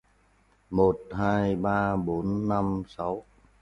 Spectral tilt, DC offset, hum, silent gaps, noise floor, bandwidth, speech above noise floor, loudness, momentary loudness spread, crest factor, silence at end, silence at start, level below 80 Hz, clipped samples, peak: -9 dB/octave; under 0.1%; none; none; -64 dBFS; 10 kHz; 37 dB; -27 LUFS; 8 LU; 20 dB; 0.4 s; 0.7 s; -50 dBFS; under 0.1%; -8 dBFS